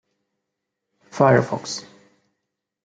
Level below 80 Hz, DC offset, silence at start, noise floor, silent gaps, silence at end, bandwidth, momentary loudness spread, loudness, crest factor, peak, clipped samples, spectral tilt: -66 dBFS; under 0.1%; 1.15 s; -81 dBFS; none; 1.05 s; 9.2 kHz; 16 LU; -20 LUFS; 22 dB; -2 dBFS; under 0.1%; -5.5 dB/octave